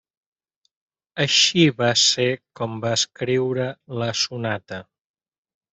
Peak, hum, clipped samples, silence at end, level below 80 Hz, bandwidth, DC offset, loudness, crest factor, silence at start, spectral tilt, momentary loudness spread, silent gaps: -4 dBFS; none; under 0.1%; 0.9 s; -64 dBFS; 8.4 kHz; under 0.1%; -20 LUFS; 20 dB; 1.15 s; -3 dB/octave; 14 LU; none